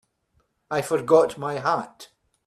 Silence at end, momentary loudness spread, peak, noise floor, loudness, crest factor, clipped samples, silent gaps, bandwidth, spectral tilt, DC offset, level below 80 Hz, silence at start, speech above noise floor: 0.4 s; 10 LU; -4 dBFS; -69 dBFS; -23 LUFS; 20 dB; under 0.1%; none; 13.5 kHz; -5.5 dB/octave; under 0.1%; -66 dBFS; 0.7 s; 47 dB